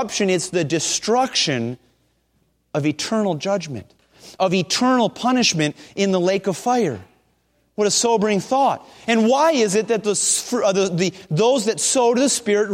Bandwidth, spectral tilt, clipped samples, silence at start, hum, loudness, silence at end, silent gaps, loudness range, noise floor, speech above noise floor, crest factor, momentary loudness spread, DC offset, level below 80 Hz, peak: 16 kHz; -3.5 dB/octave; under 0.1%; 0 s; none; -19 LUFS; 0 s; none; 4 LU; -65 dBFS; 46 dB; 14 dB; 7 LU; under 0.1%; -62 dBFS; -4 dBFS